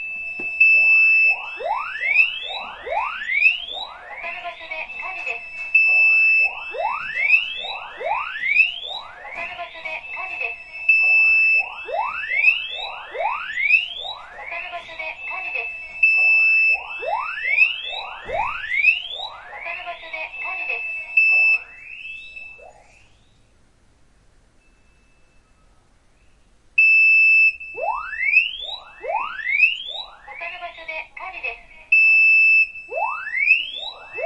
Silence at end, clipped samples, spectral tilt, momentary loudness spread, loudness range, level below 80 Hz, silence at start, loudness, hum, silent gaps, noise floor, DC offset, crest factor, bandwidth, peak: 0 s; under 0.1%; -1 dB/octave; 19 LU; 7 LU; -56 dBFS; 0 s; -17 LUFS; none; none; -56 dBFS; under 0.1%; 18 dB; 8.4 kHz; -4 dBFS